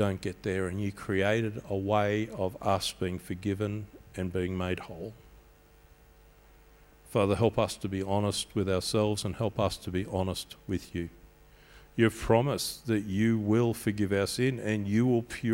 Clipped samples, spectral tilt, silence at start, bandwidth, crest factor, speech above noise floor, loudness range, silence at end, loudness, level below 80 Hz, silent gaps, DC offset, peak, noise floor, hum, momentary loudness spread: under 0.1%; -6 dB/octave; 0 s; 16.5 kHz; 22 dB; 28 dB; 7 LU; 0 s; -30 LUFS; -54 dBFS; none; under 0.1%; -8 dBFS; -58 dBFS; none; 10 LU